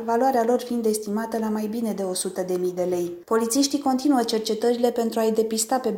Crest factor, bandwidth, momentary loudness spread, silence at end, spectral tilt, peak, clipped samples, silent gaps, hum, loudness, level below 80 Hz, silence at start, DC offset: 16 dB; 17 kHz; 5 LU; 0 s; -4 dB/octave; -8 dBFS; under 0.1%; none; none; -23 LUFS; -66 dBFS; 0 s; under 0.1%